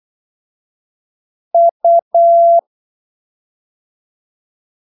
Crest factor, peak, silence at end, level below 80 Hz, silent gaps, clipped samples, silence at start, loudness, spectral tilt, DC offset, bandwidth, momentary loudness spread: 12 dB; -4 dBFS; 2.3 s; -88 dBFS; 1.71-1.80 s, 2.02-2.11 s; under 0.1%; 1.55 s; -11 LUFS; -8 dB/octave; under 0.1%; 1 kHz; 5 LU